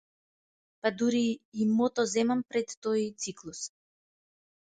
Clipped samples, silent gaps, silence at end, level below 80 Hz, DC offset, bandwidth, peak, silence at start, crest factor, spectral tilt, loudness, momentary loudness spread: under 0.1%; 1.45-1.52 s, 2.77-2.82 s; 1 s; -74 dBFS; under 0.1%; 9.2 kHz; -12 dBFS; 0.85 s; 20 dB; -4.5 dB/octave; -30 LUFS; 12 LU